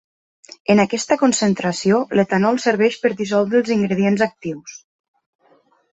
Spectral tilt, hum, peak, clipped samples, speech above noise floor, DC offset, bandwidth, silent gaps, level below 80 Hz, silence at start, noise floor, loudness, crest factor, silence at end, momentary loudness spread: -5 dB/octave; none; -2 dBFS; under 0.1%; 40 dB; under 0.1%; 8.4 kHz; none; -60 dBFS; 0.7 s; -57 dBFS; -18 LUFS; 16 dB; 1.15 s; 10 LU